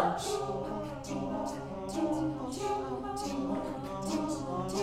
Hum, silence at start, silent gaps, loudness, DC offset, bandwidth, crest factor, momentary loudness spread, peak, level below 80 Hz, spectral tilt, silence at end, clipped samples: none; 0 s; none; -35 LUFS; under 0.1%; 15.5 kHz; 20 dB; 5 LU; -14 dBFS; -54 dBFS; -5.5 dB/octave; 0 s; under 0.1%